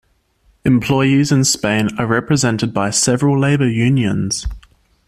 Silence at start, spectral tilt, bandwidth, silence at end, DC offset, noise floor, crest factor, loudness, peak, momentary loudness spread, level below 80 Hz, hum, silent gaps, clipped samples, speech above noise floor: 0.65 s; -5 dB/octave; 14.5 kHz; 0.5 s; under 0.1%; -57 dBFS; 14 dB; -15 LUFS; -2 dBFS; 6 LU; -38 dBFS; none; none; under 0.1%; 42 dB